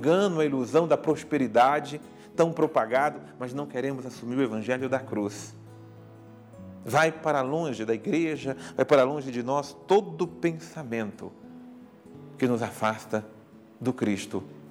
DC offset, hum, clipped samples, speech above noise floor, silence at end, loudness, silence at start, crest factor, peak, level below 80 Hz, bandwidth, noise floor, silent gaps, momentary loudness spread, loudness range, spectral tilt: under 0.1%; none; under 0.1%; 22 dB; 0 s; -27 LUFS; 0 s; 20 dB; -8 dBFS; -72 dBFS; 16 kHz; -48 dBFS; none; 18 LU; 6 LU; -6 dB/octave